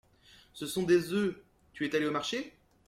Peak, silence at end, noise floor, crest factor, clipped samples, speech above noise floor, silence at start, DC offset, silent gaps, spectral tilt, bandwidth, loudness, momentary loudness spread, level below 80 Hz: -14 dBFS; 0.4 s; -60 dBFS; 18 dB; under 0.1%; 30 dB; 0.55 s; under 0.1%; none; -5 dB/octave; 16 kHz; -32 LUFS; 19 LU; -68 dBFS